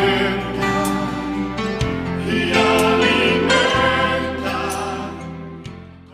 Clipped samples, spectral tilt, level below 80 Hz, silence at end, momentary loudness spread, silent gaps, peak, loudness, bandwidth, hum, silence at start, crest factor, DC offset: under 0.1%; -4.5 dB/octave; -38 dBFS; 0.1 s; 16 LU; none; -2 dBFS; -18 LUFS; 15.5 kHz; none; 0 s; 16 dB; under 0.1%